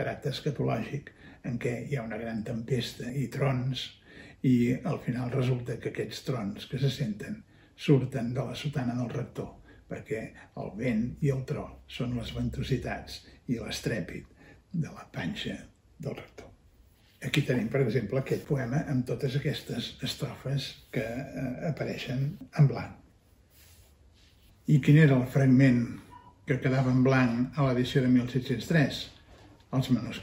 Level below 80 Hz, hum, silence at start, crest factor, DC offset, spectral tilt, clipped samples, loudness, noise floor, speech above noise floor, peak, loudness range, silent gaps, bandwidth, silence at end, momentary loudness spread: -54 dBFS; none; 0 s; 20 dB; under 0.1%; -7 dB/octave; under 0.1%; -30 LUFS; -61 dBFS; 32 dB; -10 dBFS; 9 LU; none; 16 kHz; 0 s; 16 LU